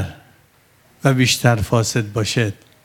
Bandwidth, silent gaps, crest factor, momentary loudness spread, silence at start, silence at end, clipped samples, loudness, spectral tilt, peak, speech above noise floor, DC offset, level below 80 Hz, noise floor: 17 kHz; none; 20 dB; 7 LU; 0 s; 0.3 s; under 0.1%; -18 LUFS; -4.5 dB/octave; 0 dBFS; 37 dB; under 0.1%; -46 dBFS; -54 dBFS